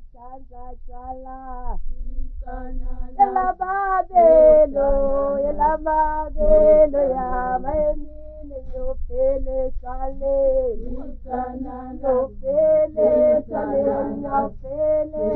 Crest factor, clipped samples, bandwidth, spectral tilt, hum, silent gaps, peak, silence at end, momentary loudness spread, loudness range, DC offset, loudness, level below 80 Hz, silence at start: 16 dB; under 0.1%; 2.6 kHz; -11.5 dB/octave; none; none; -4 dBFS; 0 s; 21 LU; 8 LU; under 0.1%; -19 LUFS; -30 dBFS; 0 s